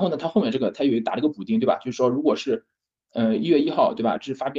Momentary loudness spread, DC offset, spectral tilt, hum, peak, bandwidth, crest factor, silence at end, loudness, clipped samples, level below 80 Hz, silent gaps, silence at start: 5 LU; under 0.1%; -7 dB/octave; none; -6 dBFS; 7.4 kHz; 16 dB; 0 s; -23 LUFS; under 0.1%; -66 dBFS; none; 0 s